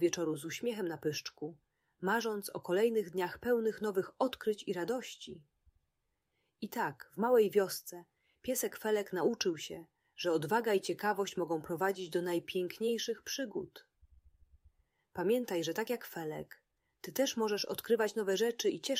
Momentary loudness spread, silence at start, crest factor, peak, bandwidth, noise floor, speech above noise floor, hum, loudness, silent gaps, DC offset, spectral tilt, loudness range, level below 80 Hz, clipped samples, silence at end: 14 LU; 0 s; 18 dB; -18 dBFS; 16 kHz; -84 dBFS; 49 dB; none; -35 LUFS; none; under 0.1%; -4 dB/octave; 5 LU; -74 dBFS; under 0.1%; 0 s